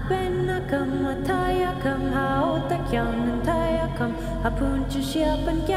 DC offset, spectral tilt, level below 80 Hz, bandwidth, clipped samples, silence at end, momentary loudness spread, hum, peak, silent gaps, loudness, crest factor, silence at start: under 0.1%; -6.5 dB/octave; -34 dBFS; 15.5 kHz; under 0.1%; 0 s; 3 LU; none; -10 dBFS; none; -25 LUFS; 14 dB; 0 s